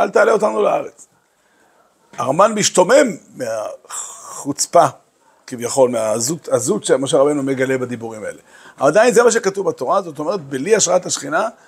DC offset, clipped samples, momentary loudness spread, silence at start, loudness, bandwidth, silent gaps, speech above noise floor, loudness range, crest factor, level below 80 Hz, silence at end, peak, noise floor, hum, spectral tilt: under 0.1%; under 0.1%; 15 LU; 0 s; -16 LUFS; 16 kHz; none; 41 dB; 2 LU; 16 dB; -66 dBFS; 0.15 s; 0 dBFS; -58 dBFS; none; -3.5 dB/octave